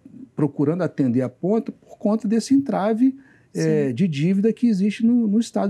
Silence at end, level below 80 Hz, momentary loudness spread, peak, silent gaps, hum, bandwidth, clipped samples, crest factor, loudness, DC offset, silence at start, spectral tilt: 0 s; -74 dBFS; 6 LU; -8 dBFS; none; none; 11.5 kHz; under 0.1%; 12 dB; -21 LUFS; under 0.1%; 0.15 s; -7.5 dB/octave